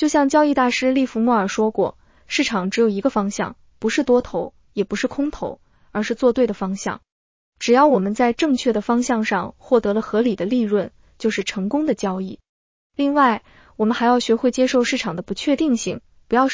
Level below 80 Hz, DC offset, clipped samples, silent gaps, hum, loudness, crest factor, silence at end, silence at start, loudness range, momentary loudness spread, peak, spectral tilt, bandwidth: -52 dBFS; under 0.1%; under 0.1%; 7.12-7.53 s, 12.49-12.90 s; none; -20 LUFS; 16 dB; 0 s; 0 s; 4 LU; 11 LU; -4 dBFS; -5 dB/octave; 7.6 kHz